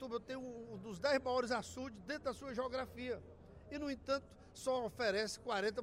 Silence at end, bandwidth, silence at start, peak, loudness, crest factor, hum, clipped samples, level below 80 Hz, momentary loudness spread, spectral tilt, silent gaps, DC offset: 0 s; 16 kHz; 0 s; -24 dBFS; -41 LUFS; 18 dB; none; under 0.1%; -64 dBFS; 12 LU; -4 dB/octave; none; under 0.1%